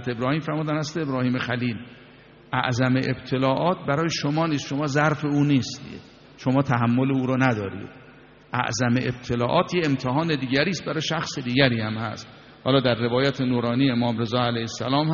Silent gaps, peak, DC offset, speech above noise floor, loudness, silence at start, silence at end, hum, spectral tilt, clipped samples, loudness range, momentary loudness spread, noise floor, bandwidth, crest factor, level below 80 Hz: none; -2 dBFS; under 0.1%; 26 dB; -24 LUFS; 0 s; 0 s; none; -5 dB/octave; under 0.1%; 2 LU; 9 LU; -49 dBFS; 7.2 kHz; 22 dB; -56 dBFS